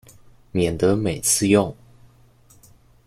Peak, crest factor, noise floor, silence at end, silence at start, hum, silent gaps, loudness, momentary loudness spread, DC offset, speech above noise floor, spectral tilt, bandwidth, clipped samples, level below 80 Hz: -4 dBFS; 20 dB; -53 dBFS; 1.35 s; 0.55 s; none; none; -20 LUFS; 10 LU; under 0.1%; 34 dB; -4.5 dB/octave; 16 kHz; under 0.1%; -48 dBFS